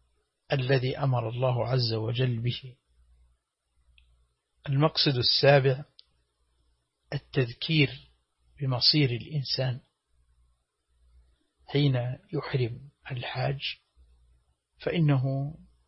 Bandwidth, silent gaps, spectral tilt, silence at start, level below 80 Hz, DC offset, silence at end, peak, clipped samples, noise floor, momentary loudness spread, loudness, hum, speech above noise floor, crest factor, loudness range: 6 kHz; none; -9 dB/octave; 0.5 s; -60 dBFS; under 0.1%; 0.3 s; -8 dBFS; under 0.1%; -73 dBFS; 16 LU; -27 LUFS; none; 47 dB; 22 dB; 6 LU